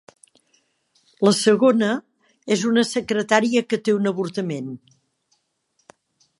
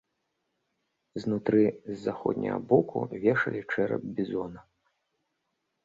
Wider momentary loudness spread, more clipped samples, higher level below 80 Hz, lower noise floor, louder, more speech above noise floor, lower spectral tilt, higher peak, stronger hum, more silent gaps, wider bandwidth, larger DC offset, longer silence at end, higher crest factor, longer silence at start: first, 13 LU vs 10 LU; neither; about the same, -70 dBFS vs -66 dBFS; second, -70 dBFS vs -80 dBFS; first, -20 LUFS vs -29 LUFS; about the same, 50 dB vs 52 dB; second, -4.5 dB/octave vs -8.5 dB/octave; first, 0 dBFS vs -8 dBFS; neither; neither; first, 11.5 kHz vs 7.6 kHz; neither; first, 1.65 s vs 1.25 s; about the same, 22 dB vs 22 dB; about the same, 1.2 s vs 1.15 s